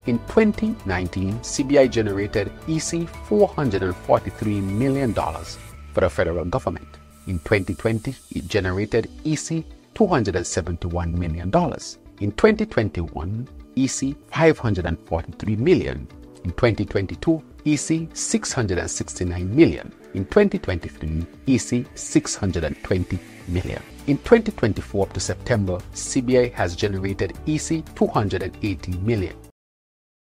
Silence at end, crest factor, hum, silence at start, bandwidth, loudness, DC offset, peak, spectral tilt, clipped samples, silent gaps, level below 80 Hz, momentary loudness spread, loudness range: 0.85 s; 22 dB; none; 0.05 s; 15.5 kHz; -23 LUFS; under 0.1%; -2 dBFS; -5.5 dB/octave; under 0.1%; none; -40 dBFS; 11 LU; 3 LU